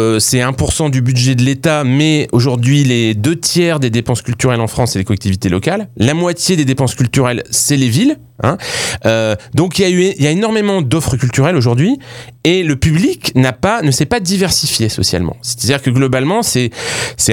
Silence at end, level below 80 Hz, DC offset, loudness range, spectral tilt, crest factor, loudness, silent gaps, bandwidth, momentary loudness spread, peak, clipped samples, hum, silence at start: 0 s; -36 dBFS; under 0.1%; 2 LU; -5 dB/octave; 12 dB; -13 LUFS; none; 19 kHz; 5 LU; 0 dBFS; under 0.1%; none; 0 s